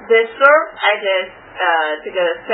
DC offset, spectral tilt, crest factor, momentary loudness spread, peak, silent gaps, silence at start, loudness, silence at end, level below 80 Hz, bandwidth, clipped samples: under 0.1%; -5 dB/octave; 16 dB; 9 LU; 0 dBFS; none; 0 s; -15 LUFS; 0 s; -60 dBFS; 5.4 kHz; under 0.1%